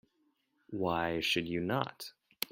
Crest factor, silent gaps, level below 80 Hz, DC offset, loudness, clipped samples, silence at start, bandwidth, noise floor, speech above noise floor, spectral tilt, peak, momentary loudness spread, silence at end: 24 dB; none; -66 dBFS; under 0.1%; -34 LUFS; under 0.1%; 0.7 s; 16.5 kHz; -76 dBFS; 42 dB; -4.5 dB/octave; -12 dBFS; 14 LU; 0.05 s